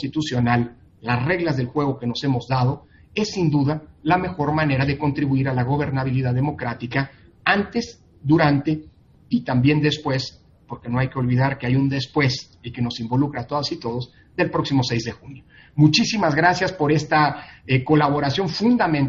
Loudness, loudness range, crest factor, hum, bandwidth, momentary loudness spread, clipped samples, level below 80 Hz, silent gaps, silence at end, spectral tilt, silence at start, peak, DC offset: -21 LUFS; 4 LU; 20 dB; none; 7.6 kHz; 11 LU; under 0.1%; -48 dBFS; none; 0 s; -6.5 dB/octave; 0 s; -2 dBFS; under 0.1%